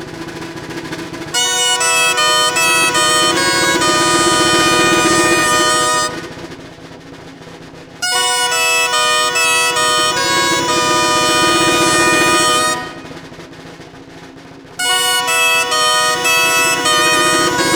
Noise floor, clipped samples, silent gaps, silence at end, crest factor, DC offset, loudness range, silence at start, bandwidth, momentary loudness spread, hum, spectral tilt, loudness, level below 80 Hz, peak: -36 dBFS; under 0.1%; none; 0 s; 14 dB; under 0.1%; 5 LU; 0 s; over 20 kHz; 15 LU; none; -1.5 dB/octave; -12 LUFS; -46 dBFS; 0 dBFS